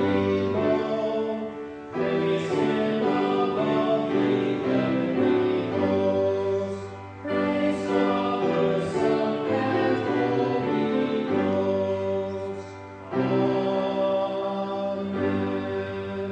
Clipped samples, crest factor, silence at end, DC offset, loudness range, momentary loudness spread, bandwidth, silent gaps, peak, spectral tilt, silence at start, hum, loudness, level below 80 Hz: under 0.1%; 14 dB; 0 s; under 0.1%; 3 LU; 8 LU; 9 kHz; none; -10 dBFS; -7.5 dB/octave; 0 s; none; -25 LUFS; -62 dBFS